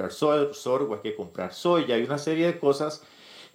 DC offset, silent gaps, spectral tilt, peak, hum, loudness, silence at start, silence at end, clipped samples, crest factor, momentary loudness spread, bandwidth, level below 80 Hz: under 0.1%; none; -5.5 dB/octave; -10 dBFS; none; -26 LUFS; 0 s; 0.1 s; under 0.1%; 18 dB; 10 LU; 16 kHz; -72 dBFS